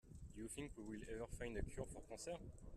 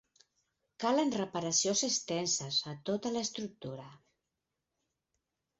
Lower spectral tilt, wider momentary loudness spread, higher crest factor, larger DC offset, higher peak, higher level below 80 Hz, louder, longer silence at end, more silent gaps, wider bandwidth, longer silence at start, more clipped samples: first, -5 dB/octave vs -3.5 dB/octave; second, 5 LU vs 13 LU; about the same, 18 dB vs 20 dB; neither; second, -34 dBFS vs -18 dBFS; first, -58 dBFS vs -74 dBFS; second, -52 LUFS vs -33 LUFS; second, 0 s vs 1.65 s; neither; first, 14 kHz vs 8 kHz; second, 0.05 s vs 0.8 s; neither